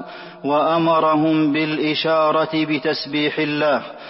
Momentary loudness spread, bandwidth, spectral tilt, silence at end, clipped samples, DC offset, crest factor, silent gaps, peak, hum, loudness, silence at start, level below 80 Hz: 5 LU; 5.8 kHz; -9.5 dB/octave; 0 s; under 0.1%; under 0.1%; 12 dB; none; -6 dBFS; none; -18 LUFS; 0 s; -64 dBFS